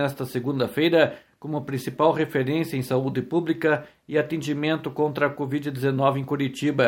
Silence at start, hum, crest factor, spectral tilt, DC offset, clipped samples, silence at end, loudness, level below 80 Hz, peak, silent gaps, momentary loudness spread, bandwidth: 0 s; none; 18 dB; -6.5 dB/octave; under 0.1%; under 0.1%; 0 s; -24 LUFS; -64 dBFS; -6 dBFS; none; 7 LU; 17 kHz